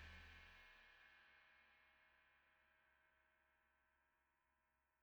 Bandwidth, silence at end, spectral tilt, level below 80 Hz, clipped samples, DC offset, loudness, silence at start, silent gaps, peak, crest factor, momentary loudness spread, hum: over 20 kHz; 0 s; -3.5 dB/octave; -78 dBFS; under 0.1%; under 0.1%; -65 LUFS; 0 s; none; -48 dBFS; 22 dB; 7 LU; none